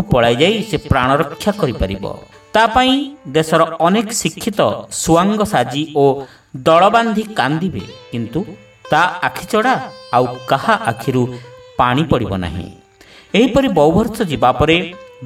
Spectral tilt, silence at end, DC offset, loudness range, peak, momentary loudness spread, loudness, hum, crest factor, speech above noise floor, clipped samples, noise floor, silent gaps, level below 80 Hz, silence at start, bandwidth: -5 dB/octave; 0 s; under 0.1%; 3 LU; 0 dBFS; 12 LU; -15 LUFS; none; 16 dB; 29 dB; under 0.1%; -44 dBFS; none; -36 dBFS; 0 s; 16.5 kHz